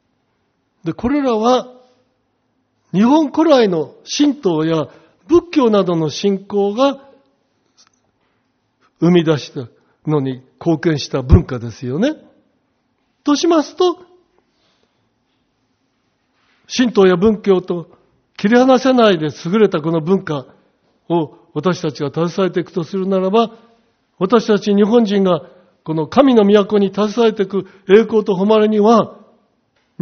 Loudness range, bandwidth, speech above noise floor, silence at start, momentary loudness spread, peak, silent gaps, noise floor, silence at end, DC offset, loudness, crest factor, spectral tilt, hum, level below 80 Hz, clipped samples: 7 LU; 6.6 kHz; 51 dB; 0.85 s; 12 LU; 0 dBFS; none; -65 dBFS; 0.85 s; under 0.1%; -15 LUFS; 16 dB; -5.5 dB/octave; none; -36 dBFS; under 0.1%